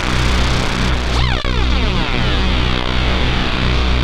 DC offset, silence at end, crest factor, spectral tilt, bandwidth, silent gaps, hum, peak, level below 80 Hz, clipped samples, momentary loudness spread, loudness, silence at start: under 0.1%; 0 s; 14 dB; -5 dB/octave; 11 kHz; none; none; 0 dBFS; -18 dBFS; under 0.1%; 1 LU; -17 LUFS; 0 s